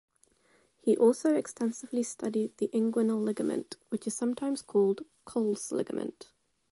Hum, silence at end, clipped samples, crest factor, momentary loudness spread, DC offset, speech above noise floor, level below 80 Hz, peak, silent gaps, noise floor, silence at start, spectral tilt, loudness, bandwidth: none; 0.6 s; under 0.1%; 18 dB; 12 LU; under 0.1%; 38 dB; -76 dBFS; -14 dBFS; none; -68 dBFS; 0.85 s; -5.5 dB/octave; -31 LUFS; 11.5 kHz